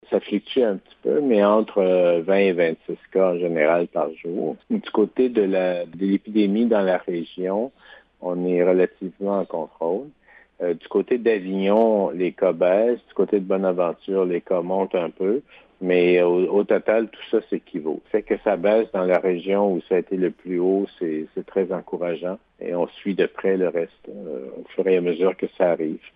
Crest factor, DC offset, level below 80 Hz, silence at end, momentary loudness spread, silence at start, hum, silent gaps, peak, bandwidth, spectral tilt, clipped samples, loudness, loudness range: 16 dB; under 0.1%; -66 dBFS; 0.2 s; 10 LU; 0.1 s; none; none; -6 dBFS; 4.9 kHz; -10 dB/octave; under 0.1%; -22 LUFS; 4 LU